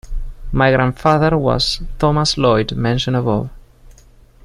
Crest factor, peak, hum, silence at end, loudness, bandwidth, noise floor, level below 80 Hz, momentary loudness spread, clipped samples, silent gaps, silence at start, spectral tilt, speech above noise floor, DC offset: 16 dB; 0 dBFS; none; 0.55 s; -16 LUFS; 12.5 kHz; -46 dBFS; -30 dBFS; 9 LU; under 0.1%; none; 0.05 s; -5.5 dB/octave; 30 dB; under 0.1%